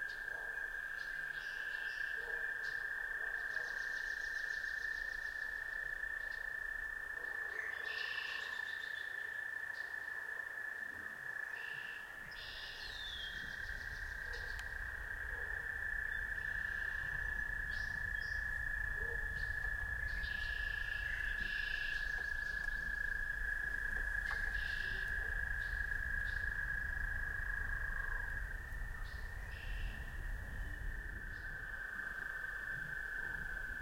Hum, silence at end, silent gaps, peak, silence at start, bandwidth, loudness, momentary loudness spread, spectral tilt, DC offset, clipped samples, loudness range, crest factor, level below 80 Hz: none; 0 s; none; -26 dBFS; 0 s; 16.5 kHz; -41 LUFS; 7 LU; -3 dB/octave; under 0.1%; under 0.1%; 5 LU; 16 dB; -48 dBFS